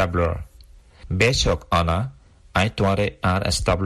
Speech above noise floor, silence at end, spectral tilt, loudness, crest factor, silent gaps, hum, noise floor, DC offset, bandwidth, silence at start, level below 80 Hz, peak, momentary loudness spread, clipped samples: 27 dB; 0 s; -5 dB/octave; -21 LUFS; 18 dB; none; none; -48 dBFS; under 0.1%; 12.5 kHz; 0 s; -34 dBFS; -4 dBFS; 8 LU; under 0.1%